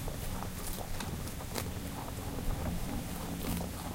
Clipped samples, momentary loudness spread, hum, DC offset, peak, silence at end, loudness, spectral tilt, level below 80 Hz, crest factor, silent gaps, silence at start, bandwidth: under 0.1%; 3 LU; none; under 0.1%; -14 dBFS; 0 s; -39 LUFS; -4.5 dB/octave; -42 dBFS; 24 dB; none; 0 s; 17 kHz